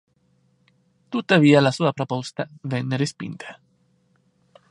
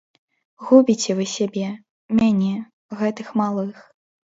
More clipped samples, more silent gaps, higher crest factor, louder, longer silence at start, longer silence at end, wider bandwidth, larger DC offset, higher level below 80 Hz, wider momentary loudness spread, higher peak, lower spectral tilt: neither; second, none vs 1.89-2.09 s, 2.73-2.89 s; about the same, 22 dB vs 20 dB; about the same, -21 LUFS vs -20 LUFS; first, 1.1 s vs 0.6 s; first, 1.15 s vs 0.55 s; first, 11 kHz vs 7.8 kHz; neither; second, -68 dBFS vs -60 dBFS; first, 19 LU vs 16 LU; about the same, -2 dBFS vs -2 dBFS; about the same, -6 dB/octave vs -5.5 dB/octave